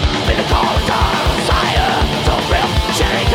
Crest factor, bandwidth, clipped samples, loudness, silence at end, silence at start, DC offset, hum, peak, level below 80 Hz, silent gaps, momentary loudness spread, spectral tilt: 14 dB; 16.5 kHz; under 0.1%; -15 LUFS; 0 s; 0 s; under 0.1%; none; 0 dBFS; -20 dBFS; none; 1 LU; -4.5 dB/octave